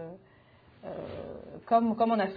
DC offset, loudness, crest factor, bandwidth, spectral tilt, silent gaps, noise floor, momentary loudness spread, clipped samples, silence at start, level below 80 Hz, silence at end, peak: under 0.1%; -29 LUFS; 20 dB; 5 kHz; -9.5 dB/octave; none; -59 dBFS; 19 LU; under 0.1%; 0 s; -64 dBFS; 0 s; -12 dBFS